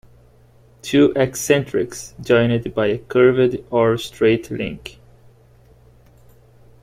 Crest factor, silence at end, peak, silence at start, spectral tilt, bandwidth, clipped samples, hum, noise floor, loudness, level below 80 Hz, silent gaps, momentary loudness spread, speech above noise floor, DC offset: 18 dB; 1.9 s; -2 dBFS; 0.85 s; -5.5 dB/octave; 16 kHz; under 0.1%; none; -50 dBFS; -18 LUFS; -50 dBFS; none; 13 LU; 33 dB; under 0.1%